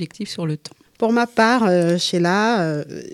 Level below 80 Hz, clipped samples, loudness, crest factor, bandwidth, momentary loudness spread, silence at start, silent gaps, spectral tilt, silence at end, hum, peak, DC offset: -64 dBFS; under 0.1%; -19 LUFS; 18 dB; 13 kHz; 11 LU; 0 s; none; -5.5 dB/octave; 0 s; none; -2 dBFS; under 0.1%